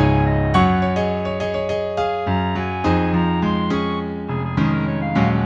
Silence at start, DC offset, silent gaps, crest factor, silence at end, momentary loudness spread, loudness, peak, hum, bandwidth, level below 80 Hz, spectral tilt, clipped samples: 0 s; under 0.1%; none; 16 dB; 0 s; 6 LU; -20 LUFS; -4 dBFS; none; 8.6 kHz; -34 dBFS; -8 dB/octave; under 0.1%